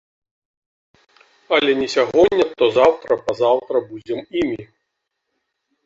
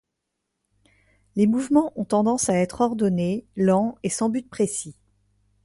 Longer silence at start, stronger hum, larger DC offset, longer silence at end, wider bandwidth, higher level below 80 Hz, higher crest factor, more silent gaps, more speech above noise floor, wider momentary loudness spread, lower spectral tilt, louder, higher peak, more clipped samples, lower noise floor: first, 1.5 s vs 1.35 s; second, none vs 50 Hz at -45 dBFS; neither; first, 1.2 s vs 0.7 s; second, 7.8 kHz vs 11.5 kHz; about the same, -54 dBFS vs -58 dBFS; about the same, 18 dB vs 18 dB; neither; about the same, 59 dB vs 58 dB; first, 10 LU vs 6 LU; second, -4.5 dB/octave vs -6 dB/octave; first, -18 LUFS vs -23 LUFS; first, -2 dBFS vs -6 dBFS; neither; second, -76 dBFS vs -80 dBFS